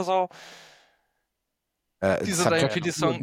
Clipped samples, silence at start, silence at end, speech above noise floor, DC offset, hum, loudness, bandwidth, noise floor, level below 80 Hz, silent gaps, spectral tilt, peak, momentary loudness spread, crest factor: under 0.1%; 0 s; 0 s; 57 dB; under 0.1%; none; -25 LUFS; 16.5 kHz; -81 dBFS; -62 dBFS; none; -4.5 dB/octave; -6 dBFS; 15 LU; 22 dB